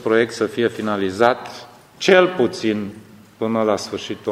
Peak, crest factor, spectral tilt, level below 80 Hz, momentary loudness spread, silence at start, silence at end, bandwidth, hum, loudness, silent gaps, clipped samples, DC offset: 0 dBFS; 20 dB; -5 dB/octave; -62 dBFS; 13 LU; 0 s; 0 s; 15 kHz; none; -19 LUFS; none; under 0.1%; under 0.1%